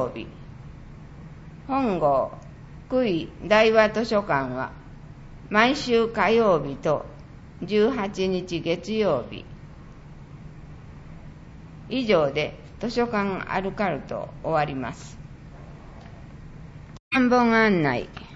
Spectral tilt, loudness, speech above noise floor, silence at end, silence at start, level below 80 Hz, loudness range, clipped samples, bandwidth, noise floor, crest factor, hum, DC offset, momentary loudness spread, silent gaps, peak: -6 dB/octave; -23 LUFS; 20 dB; 0 s; 0 s; -46 dBFS; 8 LU; under 0.1%; 8 kHz; -43 dBFS; 20 dB; none; under 0.1%; 25 LU; 17.00-17.11 s; -4 dBFS